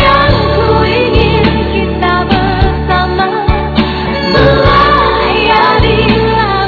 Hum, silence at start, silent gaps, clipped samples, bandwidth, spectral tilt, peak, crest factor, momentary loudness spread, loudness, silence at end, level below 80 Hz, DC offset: none; 0 s; none; 0.7%; 5.4 kHz; -8 dB/octave; 0 dBFS; 8 dB; 6 LU; -9 LUFS; 0 s; -18 dBFS; under 0.1%